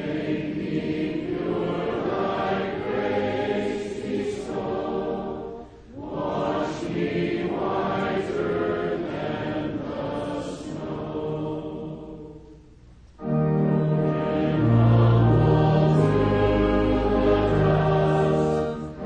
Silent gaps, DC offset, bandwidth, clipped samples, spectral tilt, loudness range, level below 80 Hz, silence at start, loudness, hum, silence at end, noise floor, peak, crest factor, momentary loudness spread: none; under 0.1%; 9.2 kHz; under 0.1%; -8.5 dB/octave; 10 LU; -40 dBFS; 0 s; -24 LUFS; none; 0 s; -49 dBFS; -8 dBFS; 16 dB; 13 LU